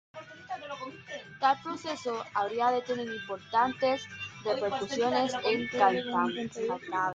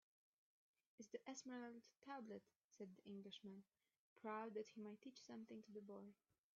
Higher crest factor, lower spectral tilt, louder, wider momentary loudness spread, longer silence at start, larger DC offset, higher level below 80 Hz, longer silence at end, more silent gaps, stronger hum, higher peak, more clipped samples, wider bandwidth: about the same, 20 dB vs 20 dB; about the same, -4 dB/octave vs -4 dB/octave; first, -30 LUFS vs -58 LUFS; first, 14 LU vs 9 LU; second, 0.15 s vs 1 s; neither; first, -74 dBFS vs under -90 dBFS; second, 0 s vs 0.45 s; second, none vs 2.64-2.70 s, 3.98-4.16 s; neither; first, -10 dBFS vs -38 dBFS; neither; first, 9 kHz vs 7.2 kHz